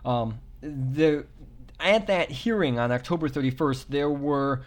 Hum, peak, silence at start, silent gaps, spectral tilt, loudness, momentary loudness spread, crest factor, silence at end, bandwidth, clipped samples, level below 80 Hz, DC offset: none; -10 dBFS; 0 s; none; -6.5 dB/octave; -26 LUFS; 9 LU; 16 dB; 0 s; 17 kHz; under 0.1%; -48 dBFS; under 0.1%